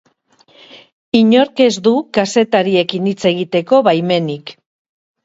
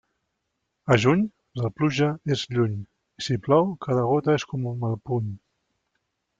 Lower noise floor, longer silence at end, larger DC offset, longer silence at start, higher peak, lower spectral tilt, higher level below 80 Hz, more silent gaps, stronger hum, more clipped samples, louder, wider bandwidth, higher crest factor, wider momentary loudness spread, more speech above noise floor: second, -53 dBFS vs -79 dBFS; second, 0.7 s vs 1.05 s; neither; about the same, 0.75 s vs 0.85 s; first, 0 dBFS vs -6 dBFS; about the same, -5.5 dB/octave vs -6.5 dB/octave; about the same, -60 dBFS vs -60 dBFS; first, 0.92-1.12 s vs none; neither; neither; first, -14 LUFS vs -24 LUFS; about the same, 8 kHz vs 7.8 kHz; second, 14 dB vs 20 dB; second, 7 LU vs 11 LU; second, 40 dB vs 55 dB